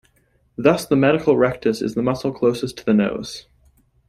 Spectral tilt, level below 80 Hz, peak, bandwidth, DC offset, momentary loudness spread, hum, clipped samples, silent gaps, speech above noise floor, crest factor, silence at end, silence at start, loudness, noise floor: -6.5 dB/octave; -52 dBFS; -2 dBFS; 15 kHz; under 0.1%; 13 LU; none; under 0.1%; none; 43 dB; 18 dB; 0.7 s; 0.6 s; -19 LUFS; -61 dBFS